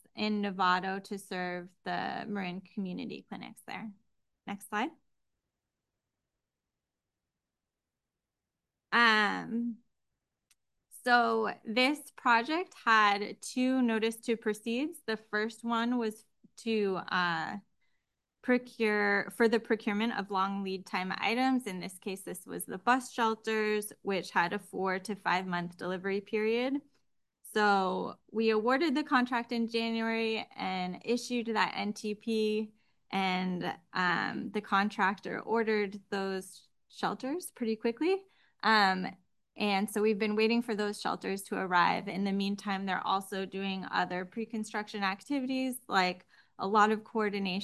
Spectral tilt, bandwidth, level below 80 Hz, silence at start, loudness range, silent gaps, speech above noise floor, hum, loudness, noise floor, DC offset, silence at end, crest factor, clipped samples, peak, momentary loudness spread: -4.5 dB/octave; 12.5 kHz; -80 dBFS; 0.15 s; 5 LU; none; 58 dB; none; -32 LUFS; -90 dBFS; under 0.1%; 0 s; 22 dB; under 0.1%; -10 dBFS; 11 LU